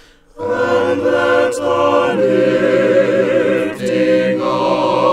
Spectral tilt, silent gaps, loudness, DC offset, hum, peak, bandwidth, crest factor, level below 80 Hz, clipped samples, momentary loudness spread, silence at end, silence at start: -5.5 dB/octave; none; -14 LUFS; under 0.1%; none; 0 dBFS; 11.5 kHz; 14 dB; -52 dBFS; under 0.1%; 4 LU; 0 s; 0.35 s